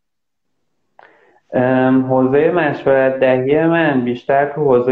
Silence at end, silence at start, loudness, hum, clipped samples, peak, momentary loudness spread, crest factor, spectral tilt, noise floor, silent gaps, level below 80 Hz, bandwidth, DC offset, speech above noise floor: 0 s; 1.5 s; -15 LUFS; none; under 0.1%; -2 dBFS; 3 LU; 14 dB; -9.5 dB/octave; -79 dBFS; none; -56 dBFS; 4.6 kHz; under 0.1%; 65 dB